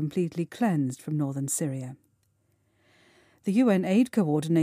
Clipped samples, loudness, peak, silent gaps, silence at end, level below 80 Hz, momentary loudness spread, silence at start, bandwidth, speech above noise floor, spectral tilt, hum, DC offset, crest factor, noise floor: under 0.1%; -27 LUFS; -12 dBFS; none; 0 s; -74 dBFS; 10 LU; 0 s; 15.5 kHz; 44 dB; -6.5 dB/octave; none; under 0.1%; 16 dB; -70 dBFS